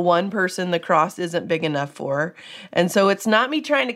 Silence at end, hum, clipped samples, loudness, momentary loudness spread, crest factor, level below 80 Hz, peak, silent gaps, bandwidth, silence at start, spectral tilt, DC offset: 0 s; none; under 0.1%; -21 LUFS; 8 LU; 18 dB; -74 dBFS; -2 dBFS; none; 16 kHz; 0 s; -5 dB/octave; under 0.1%